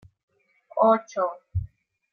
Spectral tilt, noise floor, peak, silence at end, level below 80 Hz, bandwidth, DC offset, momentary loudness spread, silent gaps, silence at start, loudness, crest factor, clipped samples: -7.5 dB/octave; -46 dBFS; -6 dBFS; 0.45 s; -50 dBFS; 6.6 kHz; under 0.1%; 14 LU; none; 0.75 s; -25 LUFS; 20 dB; under 0.1%